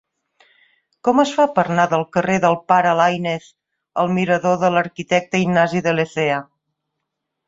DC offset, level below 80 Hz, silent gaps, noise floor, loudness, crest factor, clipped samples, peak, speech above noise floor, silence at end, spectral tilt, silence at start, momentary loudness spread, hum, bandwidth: under 0.1%; -60 dBFS; none; -78 dBFS; -18 LUFS; 18 dB; under 0.1%; -2 dBFS; 61 dB; 1.05 s; -6 dB/octave; 1.05 s; 7 LU; none; 7.8 kHz